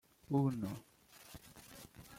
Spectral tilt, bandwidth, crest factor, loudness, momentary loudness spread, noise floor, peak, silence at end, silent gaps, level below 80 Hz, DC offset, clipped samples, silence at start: -7.5 dB/octave; 16.5 kHz; 18 dB; -38 LUFS; 20 LU; -58 dBFS; -24 dBFS; 0 s; none; -68 dBFS; under 0.1%; under 0.1%; 0.3 s